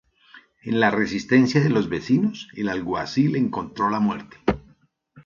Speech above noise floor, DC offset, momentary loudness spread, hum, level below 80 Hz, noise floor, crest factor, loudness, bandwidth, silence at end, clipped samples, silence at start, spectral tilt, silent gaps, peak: 37 dB; under 0.1%; 8 LU; none; -50 dBFS; -58 dBFS; 18 dB; -22 LUFS; 7.2 kHz; 0.05 s; under 0.1%; 0.35 s; -6.5 dB/octave; none; -4 dBFS